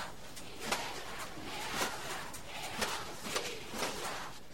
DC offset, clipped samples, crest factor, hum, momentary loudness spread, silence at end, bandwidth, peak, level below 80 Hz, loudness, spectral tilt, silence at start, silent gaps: 0.5%; under 0.1%; 24 dB; none; 7 LU; 0 s; 16.5 kHz; -18 dBFS; -60 dBFS; -39 LUFS; -2 dB/octave; 0 s; none